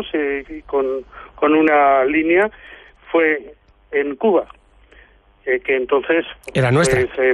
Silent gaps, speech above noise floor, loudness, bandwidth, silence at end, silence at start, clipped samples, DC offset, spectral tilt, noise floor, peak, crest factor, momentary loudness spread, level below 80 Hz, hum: none; 33 dB; -18 LUFS; 11.5 kHz; 0 s; 0 s; under 0.1%; under 0.1%; -6 dB/octave; -50 dBFS; -4 dBFS; 14 dB; 10 LU; -46 dBFS; none